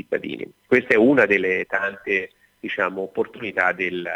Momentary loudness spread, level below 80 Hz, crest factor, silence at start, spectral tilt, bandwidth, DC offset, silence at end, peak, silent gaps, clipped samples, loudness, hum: 14 LU; -62 dBFS; 18 dB; 0.1 s; -6.5 dB/octave; 10.5 kHz; under 0.1%; 0 s; -4 dBFS; none; under 0.1%; -21 LUFS; none